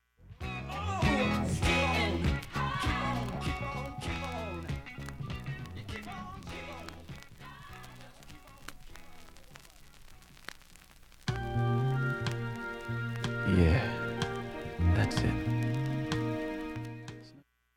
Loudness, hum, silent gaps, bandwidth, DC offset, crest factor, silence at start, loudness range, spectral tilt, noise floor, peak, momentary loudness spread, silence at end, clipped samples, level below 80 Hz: -33 LUFS; none; none; 16 kHz; under 0.1%; 22 dB; 0.2 s; 19 LU; -6 dB/octave; -59 dBFS; -12 dBFS; 21 LU; 0.35 s; under 0.1%; -44 dBFS